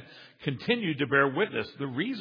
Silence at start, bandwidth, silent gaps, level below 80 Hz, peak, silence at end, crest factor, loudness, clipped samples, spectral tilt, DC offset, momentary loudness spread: 0 s; 5.2 kHz; none; -70 dBFS; -10 dBFS; 0 s; 20 dB; -28 LUFS; under 0.1%; -8 dB/octave; under 0.1%; 10 LU